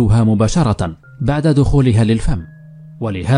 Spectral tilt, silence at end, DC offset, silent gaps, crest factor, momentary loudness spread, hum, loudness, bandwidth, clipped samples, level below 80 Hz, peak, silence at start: -7.5 dB/octave; 0 s; under 0.1%; none; 12 dB; 11 LU; none; -16 LUFS; 10.5 kHz; under 0.1%; -26 dBFS; -2 dBFS; 0 s